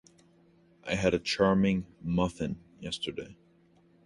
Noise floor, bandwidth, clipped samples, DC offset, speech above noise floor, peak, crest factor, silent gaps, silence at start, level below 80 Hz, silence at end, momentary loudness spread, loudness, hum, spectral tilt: -63 dBFS; 11.5 kHz; under 0.1%; under 0.1%; 34 dB; -12 dBFS; 20 dB; none; 0.85 s; -52 dBFS; 0.7 s; 16 LU; -30 LUFS; none; -6 dB/octave